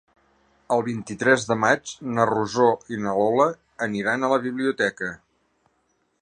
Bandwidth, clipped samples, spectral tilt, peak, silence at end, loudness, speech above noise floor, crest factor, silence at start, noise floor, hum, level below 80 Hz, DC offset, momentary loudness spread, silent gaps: 10 kHz; under 0.1%; -5 dB/octave; -4 dBFS; 1.05 s; -23 LUFS; 47 dB; 20 dB; 0.7 s; -69 dBFS; none; -62 dBFS; under 0.1%; 9 LU; none